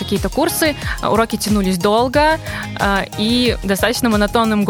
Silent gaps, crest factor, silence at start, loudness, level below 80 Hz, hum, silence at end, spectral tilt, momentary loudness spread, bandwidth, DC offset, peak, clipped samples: none; 14 dB; 0 s; -16 LUFS; -32 dBFS; none; 0 s; -4.5 dB/octave; 5 LU; 19.5 kHz; under 0.1%; -2 dBFS; under 0.1%